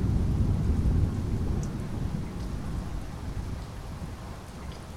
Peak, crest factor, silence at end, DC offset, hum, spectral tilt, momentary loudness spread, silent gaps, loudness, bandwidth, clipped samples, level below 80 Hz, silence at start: -12 dBFS; 16 dB; 0 s; under 0.1%; none; -7.5 dB/octave; 13 LU; none; -32 LUFS; 14 kHz; under 0.1%; -34 dBFS; 0 s